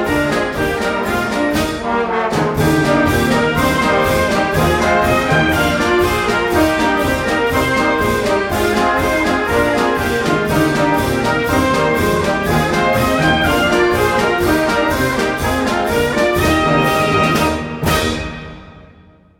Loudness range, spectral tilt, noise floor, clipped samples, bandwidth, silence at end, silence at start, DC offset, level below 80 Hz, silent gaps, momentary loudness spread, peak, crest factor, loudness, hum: 1 LU; -5 dB/octave; -45 dBFS; under 0.1%; 17 kHz; 0.6 s; 0 s; under 0.1%; -32 dBFS; none; 4 LU; -2 dBFS; 12 dB; -15 LUFS; none